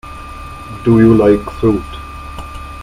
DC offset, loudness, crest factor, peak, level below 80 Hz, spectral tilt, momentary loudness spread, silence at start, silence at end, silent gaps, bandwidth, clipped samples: under 0.1%; -12 LUFS; 14 dB; 0 dBFS; -32 dBFS; -8.5 dB/octave; 21 LU; 0.05 s; 0 s; none; 13 kHz; under 0.1%